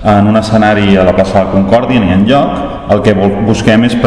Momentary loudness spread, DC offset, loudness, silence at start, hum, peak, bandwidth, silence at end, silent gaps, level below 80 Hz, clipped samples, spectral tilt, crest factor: 3 LU; under 0.1%; -9 LUFS; 0 s; none; 0 dBFS; 10.5 kHz; 0 s; none; -28 dBFS; 3%; -7 dB/octave; 8 dB